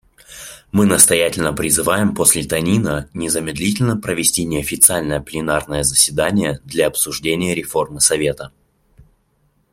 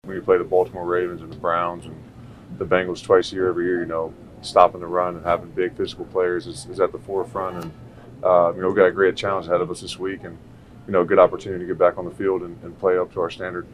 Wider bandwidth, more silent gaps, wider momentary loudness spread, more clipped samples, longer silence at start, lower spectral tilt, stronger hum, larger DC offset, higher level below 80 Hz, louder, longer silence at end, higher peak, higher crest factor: first, 16.5 kHz vs 11.5 kHz; neither; second, 11 LU vs 14 LU; neither; first, 0.3 s vs 0.05 s; second, -3 dB/octave vs -6 dB/octave; neither; neither; first, -42 dBFS vs -52 dBFS; first, -16 LUFS vs -22 LUFS; first, 1.25 s vs 0 s; about the same, 0 dBFS vs 0 dBFS; about the same, 18 dB vs 22 dB